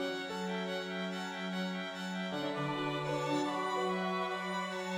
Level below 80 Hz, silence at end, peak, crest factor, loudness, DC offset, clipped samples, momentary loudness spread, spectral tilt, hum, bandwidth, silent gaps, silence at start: -76 dBFS; 0 s; -22 dBFS; 14 dB; -36 LUFS; under 0.1%; under 0.1%; 4 LU; -5 dB/octave; none; 15.5 kHz; none; 0 s